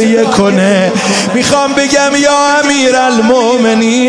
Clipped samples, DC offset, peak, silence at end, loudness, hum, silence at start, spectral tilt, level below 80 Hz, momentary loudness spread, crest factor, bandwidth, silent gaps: under 0.1%; under 0.1%; 0 dBFS; 0 s; -9 LUFS; none; 0 s; -3.5 dB/octave; -46 dBFS; 2 LU; 8 dB; 10.5 kHz; none